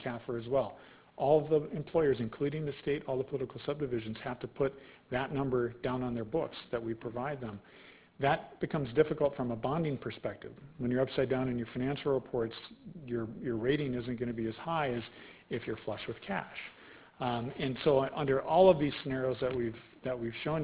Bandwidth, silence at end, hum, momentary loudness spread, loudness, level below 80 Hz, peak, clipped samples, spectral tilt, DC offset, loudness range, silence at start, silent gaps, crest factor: 4 kHz; 0 s; none; 12 LU; -34 LUFS; -60 dBFS; -12 dBFS; under 0.1%; -5.5 dB/octave; under 0.1%; 6 LU; 0 s; none; 22 dB